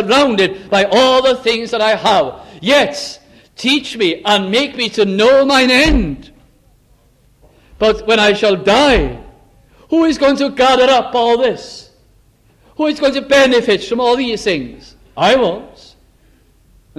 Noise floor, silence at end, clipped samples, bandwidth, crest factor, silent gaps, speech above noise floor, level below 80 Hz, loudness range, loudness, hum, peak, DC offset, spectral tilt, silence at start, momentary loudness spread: -51 dBFS; 1.3 s; under 0.1%; 14 kHz; 14 dB; none; 39 dB; -32 dBFS; 2 LU; -13 LUFS; none; 0 dBFS; under 0.1%; -4 dB/octave; 0 s; 12 LU